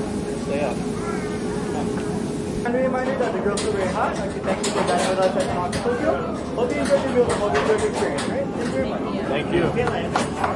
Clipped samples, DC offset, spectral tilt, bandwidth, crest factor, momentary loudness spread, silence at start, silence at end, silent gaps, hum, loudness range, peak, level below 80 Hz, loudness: under 0.1%; under 0.1%; -5.5 dB/octave; 11.5 kHz; 18 dB; 6 LU; 0 s; 0 s; none; none; 3 LU; -4 dBFS; -44 dBFS; -23 LUFS